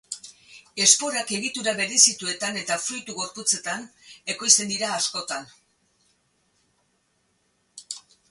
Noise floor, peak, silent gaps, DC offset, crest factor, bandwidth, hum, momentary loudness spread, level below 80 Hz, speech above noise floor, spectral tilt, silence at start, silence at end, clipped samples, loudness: -69 dBFS; 0 dBFS; none; under 0.1%; 26 dB; 12 kHz; none; 20 LU; -72 dBFS; 45 dB; 0 dB/octave; 0.1 s; 0.3 s; under 0.1%; -22 LUFS